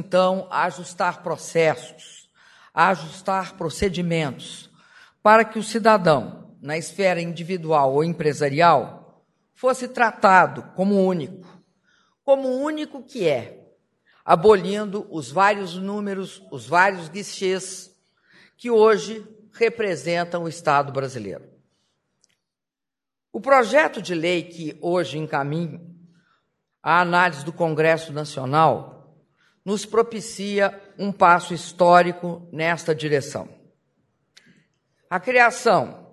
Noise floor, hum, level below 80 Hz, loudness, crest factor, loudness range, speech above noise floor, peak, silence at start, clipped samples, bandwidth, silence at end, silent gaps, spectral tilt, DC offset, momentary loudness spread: -89 dBFS; none; -58 dBFS; -21 LUFS; 22 dB; 5 LU; 68 dB; 0 dBFS; 0 s; under 0.1%; 12.5 kHz; 0.15 s; none; -5 dB/octave; under 0.1%; 16 LU